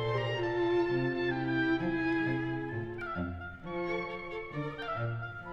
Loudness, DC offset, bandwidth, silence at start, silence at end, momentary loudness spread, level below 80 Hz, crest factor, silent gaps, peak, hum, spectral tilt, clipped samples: -33 LUFS; under 0.1%; 6.6 kHz; 0 s; 0 s; 9 LU; -54 dBFS; 14 dB; none; -20 dBFS; none; -8 dB/octave; under 0.1%